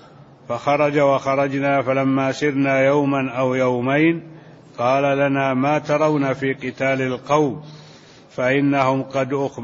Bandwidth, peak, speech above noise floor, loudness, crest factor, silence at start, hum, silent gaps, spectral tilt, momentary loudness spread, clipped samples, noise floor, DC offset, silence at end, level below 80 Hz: 7.6 kHz; -4 dBFS; 26 dB; -19 LUFS; 16 dB; 0.5 s; none; none; -6.5 dB/octave; 6 LU; under 0.1%; -45 dBFS; under 0.1%; 0 s; -60 dBFS